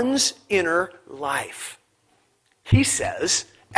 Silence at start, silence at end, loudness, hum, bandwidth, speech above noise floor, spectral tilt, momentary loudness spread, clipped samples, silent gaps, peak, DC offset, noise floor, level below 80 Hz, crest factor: 0 s; 0 s; -22 LUFS; none; 11 kHz; 42 dB; -3.5 dB/octave; 13 LU; under 0.1%; none; 0 dBFS; under 0.1%; -65 dBFS; -44 dBFS; 24 dB